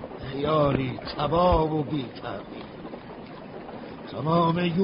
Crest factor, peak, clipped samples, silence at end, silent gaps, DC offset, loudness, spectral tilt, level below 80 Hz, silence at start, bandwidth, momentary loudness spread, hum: 18 dB; -8 dBFS; under 0.1%; 0 s; none; under 0.1%; -25 LUFS; -11.5 dB/octave; -42 dBFS; 0 s; 5.4 kHz; 18 LU; none